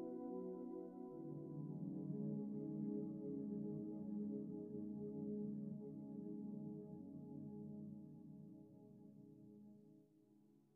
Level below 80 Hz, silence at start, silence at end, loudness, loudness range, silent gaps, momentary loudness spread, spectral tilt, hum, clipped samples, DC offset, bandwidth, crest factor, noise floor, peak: -88 dBFS; 0 s; 0.15 s; -50 LUFS; 10 LU; none; 16 LU; -13 dB/octave; none; under 0.1%; under 0.1%; 1.8 kHz; 14 dB; -72 dBFS; -36 dBFS